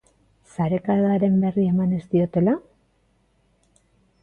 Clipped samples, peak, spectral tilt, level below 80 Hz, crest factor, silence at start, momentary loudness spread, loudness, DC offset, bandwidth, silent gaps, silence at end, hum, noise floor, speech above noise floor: under 0.1%; -10 dBFS; -10 dB/octave; -56 dBFS; 14 dB; 0.6 s; 7 LU; -21 LUFS; under 0.1%; 8.6 kHz; none; 1.65 s; none; -64 dBFS; 44 dB